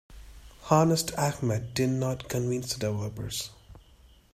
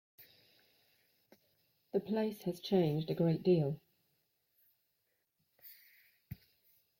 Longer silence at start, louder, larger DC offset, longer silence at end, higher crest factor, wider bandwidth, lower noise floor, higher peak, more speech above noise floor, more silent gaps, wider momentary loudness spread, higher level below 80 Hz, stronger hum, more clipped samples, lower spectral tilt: about the same, 0.1 s vs 0.2 s; first, -28 LUFS vs -35 LUFS; neither; about the same, 0.55 s vs 0.65 s; about the same, 22 dB vs 20 dB; about the same, 16 kHz vs 16.5 kHz; second, -57 dBFS vs -82 dBFS; first, -6 dBFS vs -20 dBFS; second, 29 dB vs 49 dB; neither; second, 11 LU vs 23 LU; first, -52 dBFS vs -74 dBFS; neither; neither; second, -5 dB/octave vs -8.5 dB/octave